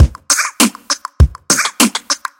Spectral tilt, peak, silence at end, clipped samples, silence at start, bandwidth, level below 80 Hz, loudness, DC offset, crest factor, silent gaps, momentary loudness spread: -3 dB/octave; 0 dBFS; 0.25 s; 0.4%; 0 s; 17.5 kHz; -20 dBFS; -13 LUFS; under 0.1%; 14 dB; none; 7 LU